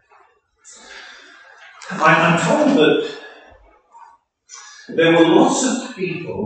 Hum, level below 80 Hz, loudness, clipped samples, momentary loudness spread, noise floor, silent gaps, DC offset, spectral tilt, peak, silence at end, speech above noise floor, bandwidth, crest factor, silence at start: none; -64 dBFS; -15 LUFS; under 0.1%; 25 LU; -55 dBFS; none; under 0.1%; -4.5 dB/octave; 0 dBFS; 0 s; 39 dB; 9.2 kHz; 18 dB; 0.9 s